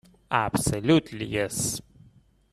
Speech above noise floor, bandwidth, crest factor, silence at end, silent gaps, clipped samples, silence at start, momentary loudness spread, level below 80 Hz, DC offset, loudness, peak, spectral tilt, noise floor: 32 dB; 14.5 kHz; 22 dB; 0.7 s; none; under 0.1%; 0.3 s; 7 LU; -50 dBFS; under 0.1%; -26 LUFS; -6 dBFS; -4.5 dB/octave; -58 dBFS